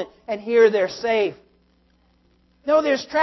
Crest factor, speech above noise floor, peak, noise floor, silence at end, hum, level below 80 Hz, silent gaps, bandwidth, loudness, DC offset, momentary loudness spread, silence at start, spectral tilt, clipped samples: 18 dB; 41 dB; -4 dBFS; -61 dBFS; 0 s; none; -62 dBFS; none; 6 kHz; -20 LUFS; under 0.1%; 13 LU; 0 s; -4.5 dB/octave; under 0.1%